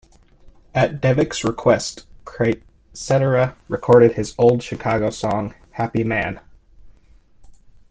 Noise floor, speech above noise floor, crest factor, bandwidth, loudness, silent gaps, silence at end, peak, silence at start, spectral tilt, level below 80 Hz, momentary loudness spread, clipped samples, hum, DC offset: -50 dBFS; 32 dB; 18 dB; 9.6 kHz; -19 LUFS; none; 0.35 s; -2 dBFS; 0.45 s; -6 dB/octave; -46 dBFS; 14 LU; under 0.1%; none; under 0.1%